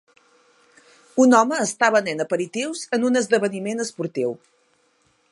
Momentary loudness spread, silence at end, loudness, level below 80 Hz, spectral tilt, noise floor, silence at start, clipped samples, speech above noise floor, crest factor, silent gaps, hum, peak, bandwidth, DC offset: 12 LU; 0.95 s; -21 LUFS; -76 dBFS; -4 dB/octave; -64 dBFS; 1.15 s; under 0.1%; 43 dB; 20 dB; none; none; -2 dBFS; 11.5 kHz; under 0.1%